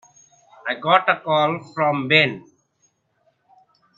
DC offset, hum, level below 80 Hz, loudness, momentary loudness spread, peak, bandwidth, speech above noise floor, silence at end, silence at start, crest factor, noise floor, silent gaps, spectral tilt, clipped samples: under 0.1%; none; -70 dBFS; -19 LUFS; 12 LU; 0 dBFS; 7.6 kHz; 47 dB; 1.6 s; 0.65 s; 22 dB; -66 dBFS; none; -5.5 dB/octave; under 0.1%